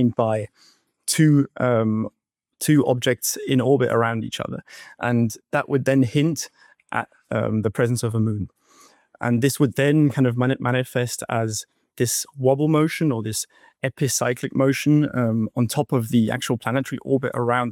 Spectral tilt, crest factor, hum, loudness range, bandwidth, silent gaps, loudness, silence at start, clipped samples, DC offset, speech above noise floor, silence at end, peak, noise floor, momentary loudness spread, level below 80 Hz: -5.5 dB/octave; 16 dB; none; 2 LU; 17 kHz; none; -22 LUFS; 0 s; under 0.1%; under 0.1%; 33 dB; 0 s; -6 dBFS; -54 dBFS; 11 LU; -62 dBFS